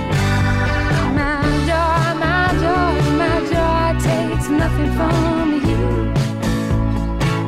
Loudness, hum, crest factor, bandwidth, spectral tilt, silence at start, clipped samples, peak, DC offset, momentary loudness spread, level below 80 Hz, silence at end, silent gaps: -17 LUFS; none; 8 dB; 15 kHz; -6.5 dB/octave; 0 s; under 0.1%; -8 dBFS; under 0.1%; 3 LU; -24 dBFS; 0 s; none